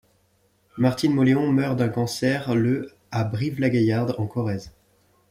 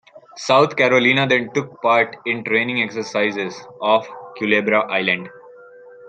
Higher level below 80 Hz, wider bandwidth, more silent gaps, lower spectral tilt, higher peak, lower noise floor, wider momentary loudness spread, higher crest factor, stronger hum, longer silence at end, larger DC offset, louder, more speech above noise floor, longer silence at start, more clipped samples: first, -58 dBFS vs -66 dBFS; first, 15.5 kHz vs 9.2 kHz; neither; first, -7 dB/octave vs -4.5 dB/octave; second, -8 dBFS vs -2 dBFS; first, -64 dBFS vs -43 dBFS; about the same, 9 LU vs 11 LU; about the same, 16 dB vs 18 dB; neither; first, 0.6 s vs 0 s; neither; second, -23 LUFS vs -18 LUFS; first, 42 dB vs 24 dB; first, 0.75 s vs 0.15 s; neither